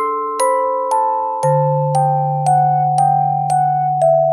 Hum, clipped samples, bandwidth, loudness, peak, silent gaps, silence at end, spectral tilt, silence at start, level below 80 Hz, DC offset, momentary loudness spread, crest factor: none; under 0.1%; 13.5 kHz; -15 LUFS; -4 dBFS; none; 0 s; -7 dB/octave; 0 s; -70 dBFS; under 0.1%; 3 LU; 10 dB